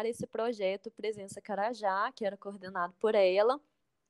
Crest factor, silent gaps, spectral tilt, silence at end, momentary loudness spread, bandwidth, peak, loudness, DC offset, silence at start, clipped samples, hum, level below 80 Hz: 18 dB; none; -4.5 dB/octave; 0.5 s; 12 LU; 12.5 kHz; -16 dBFS; -32 LUFS; under 0.1%; 0 s; under 0.1%; none; -80 dBFS